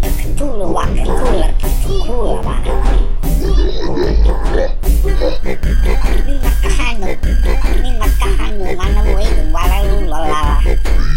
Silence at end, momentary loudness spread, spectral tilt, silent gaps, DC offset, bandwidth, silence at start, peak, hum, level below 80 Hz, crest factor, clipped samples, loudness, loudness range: 0 s; 4 LU; -6 dB/octave; none; under 0.1%; 16.5 kHz; 0 s; 0 dBFS; none; -12 dBFS; 10 dB; under 0.1%; -17 LUFS; 1 LU